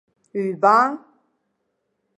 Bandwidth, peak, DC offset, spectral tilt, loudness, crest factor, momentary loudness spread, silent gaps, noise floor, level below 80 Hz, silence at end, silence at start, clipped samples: 10.5 kHz; -2 dBFS; under 0.1%; -6 dB/octave; -19 LUFS; 20 dB; 17 LU; none; -74 dBFS; -82 dBFS; 1.2 s; 0.35 s; under 0.1%